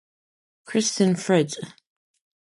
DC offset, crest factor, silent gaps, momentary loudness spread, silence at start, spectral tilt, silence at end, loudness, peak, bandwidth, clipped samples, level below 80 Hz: under 0.1%; 18 dB; none; 14 LU; 0.7 s; -4.5 dB/octave; 0.7 s; -23 LUFS; -8 dBFS; 11.5 kHz; under 0.1%; -70 dBFS